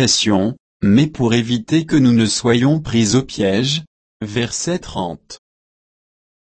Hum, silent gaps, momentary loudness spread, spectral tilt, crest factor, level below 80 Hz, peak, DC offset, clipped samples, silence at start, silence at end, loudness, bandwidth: none; 0.60-0.80 s, 3.87-4.20 s; 11 LU; -4.5 dB/octave; 14 dB; -46 dBFS; -2 dBFS; under 0.1%; under 0.1%; 0 s; 1.1 s; -17 LUFS; 8.8 kHz